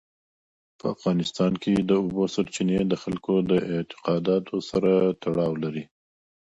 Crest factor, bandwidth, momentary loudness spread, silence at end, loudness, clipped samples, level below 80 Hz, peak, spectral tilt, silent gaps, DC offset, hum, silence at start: 16 dB; 8.2 kHz; 8 LU; 0.65 s; -25 LUFS; under 0.1%; -56 dBFS; -8 dBFS; -7 dB/octave; none; under 0.1%; none; 0.85 s